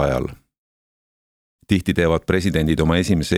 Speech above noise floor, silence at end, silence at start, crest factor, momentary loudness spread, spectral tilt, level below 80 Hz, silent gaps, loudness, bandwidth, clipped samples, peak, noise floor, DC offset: over 72 dB; 0 s; 0 s; 18 dB; 5 LU; -6 dB/octave; -36 dBFS; 0.58-1.59 s; -19 LUFS; 15.5 kHz; under 0.1%; -2 dBFS; under -90 dBFS; under 0.1%